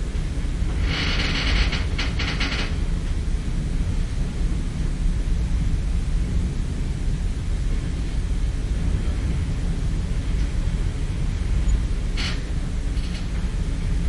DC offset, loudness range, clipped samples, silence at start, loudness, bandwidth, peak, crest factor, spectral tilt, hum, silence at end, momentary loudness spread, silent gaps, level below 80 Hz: under 0.1%; 3 LU; under 0.1%; 0 s; -26 LUFS; 11 kHz; -8 dBFS; 14 dB; -5.5 dB/octave; none; 0 s; 5 LU; none; -24 dBFS